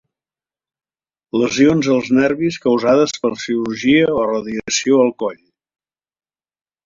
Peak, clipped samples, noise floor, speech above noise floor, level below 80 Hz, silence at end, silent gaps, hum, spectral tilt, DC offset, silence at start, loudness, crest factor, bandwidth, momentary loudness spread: -2 dBFS; under 0.1%; under -90 dBFS; over 75 dB; -54 dBFS; 1.5 s; none; none; -4.5 dB/octave; under 0.1%; 1.35 s; -16 LUFS; 16 dB; 7.6 kHz; 8 LU